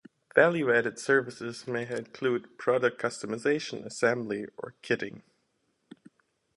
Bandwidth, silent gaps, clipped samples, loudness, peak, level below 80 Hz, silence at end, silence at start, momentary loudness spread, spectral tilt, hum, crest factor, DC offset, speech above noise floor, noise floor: 11.5 kHz; none; under 0.1%; -29 LUFS; -6 dBFS; -74 dBFS; 1.35 s; 0.35 s; 13 LU; -5 dB/octave; none; 24 dB; under 0.1%; 46 dB; -75 dBFS